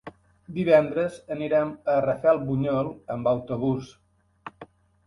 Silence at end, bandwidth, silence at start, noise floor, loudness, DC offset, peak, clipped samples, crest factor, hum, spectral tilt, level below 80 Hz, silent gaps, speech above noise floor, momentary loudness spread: 0.4 s; 11 kHz; 0.05 s; -50 dBFS; -25 LUFS; under 0.1%; -6 dBFS; under 0.1%; 20 dB; none; -8 dB/octave; -58 dBFS; none; 26 dB; 17 LU